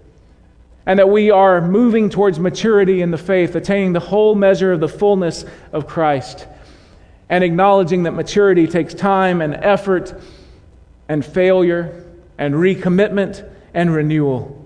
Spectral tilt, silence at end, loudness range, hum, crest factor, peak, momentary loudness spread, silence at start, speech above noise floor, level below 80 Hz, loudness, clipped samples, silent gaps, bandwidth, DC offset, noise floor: -7 dB/octave; 0 s; 4 LU; none; 14 dB; -2 dBFS; 11 LU; 0.85 s; 32 dB; -46 dBFS; -15 LUFS; under 0.1%; none; 10 kHz; under 0.1%; -47 dBFS